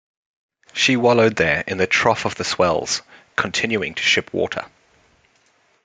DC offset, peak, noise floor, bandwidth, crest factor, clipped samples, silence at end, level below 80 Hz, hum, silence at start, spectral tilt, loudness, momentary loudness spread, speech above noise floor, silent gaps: under 0.1%; 0 dBFS; -60 dBFS; 9.6 kHz; 20 dB; under 0.1%; 1.15 s; -56 dBFS; none; 0.75 s; -3.5 dB/octave; -19 LUFS; 9 LU; 41 dB; none